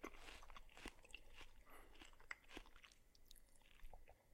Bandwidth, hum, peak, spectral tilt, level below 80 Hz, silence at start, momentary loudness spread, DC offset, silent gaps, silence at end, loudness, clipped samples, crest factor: 16 kHz; none; -30 dBFS; -3 dB/octave; -64 dBFS; 0 s; 11 LU; under 0.1%; none; 0 s; -62 LUFS; under 0.1%; 30 dB